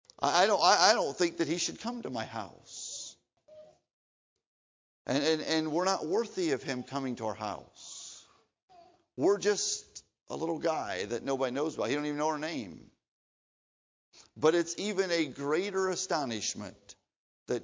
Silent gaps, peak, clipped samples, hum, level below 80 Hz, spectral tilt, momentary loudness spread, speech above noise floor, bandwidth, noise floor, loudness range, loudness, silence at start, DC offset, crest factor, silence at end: 3.93-4.36 s, 4.46-5.05 s, 8.63-8.68 s, 13.08-14.12 s, 17.16-17.46 s; -8 dBFS; under 0.1%; none; -72 dBFS; -3 dB/octave; 17 LU; 29 dB; 7.8 kHz; -60 dBFS; 5 LU; -31 LUFS; 0.2 s; under 0.1%; 24 dB; 0 s